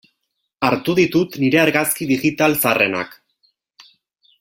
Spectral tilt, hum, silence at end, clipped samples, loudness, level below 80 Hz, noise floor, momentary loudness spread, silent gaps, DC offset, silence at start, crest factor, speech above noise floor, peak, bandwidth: -4.5 dB/octave; none; 1.35 s; under 0.1%; -17 LUFS; -56 dBFS; -74 dBFS; 5 LU; none; under 0.1%; 0.6 s; 20 dB; 57 dB; 0 dBFS; 17 kHz